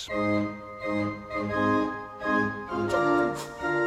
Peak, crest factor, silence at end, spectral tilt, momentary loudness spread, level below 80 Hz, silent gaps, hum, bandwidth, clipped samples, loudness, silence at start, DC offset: -12 dBFS; 16 dB; 0 s; -6 dB/octave; 8 LU; -54 dBFS; none; none; 15 kHz; under 0.1%; -28 LUFS; 0 s; under 0.1%